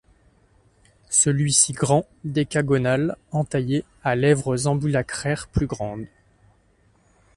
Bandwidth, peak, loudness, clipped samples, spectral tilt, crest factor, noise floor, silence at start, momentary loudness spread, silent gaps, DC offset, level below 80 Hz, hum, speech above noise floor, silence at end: 11.5 kHz; -2 dBFS; -22 LUFS; under 0.1%; -4.5 dB/octave; 22 dB; -60 dBFS; 1.1 s; 10 LU; none; under 0.1%; -46 dBFS; none; 38 dB; 1.3 s